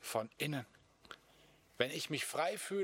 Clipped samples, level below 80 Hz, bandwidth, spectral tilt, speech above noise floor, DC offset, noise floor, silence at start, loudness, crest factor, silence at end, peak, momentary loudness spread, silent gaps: under 0.1%; -80 dBFS; 17 kHz; -3.5 dB/octave; 28 dB; under 0.1%; -66 dBFS; 0 s; -39 LUFS; 26 dB; 0 s; -14 dBFS; 20 LU; none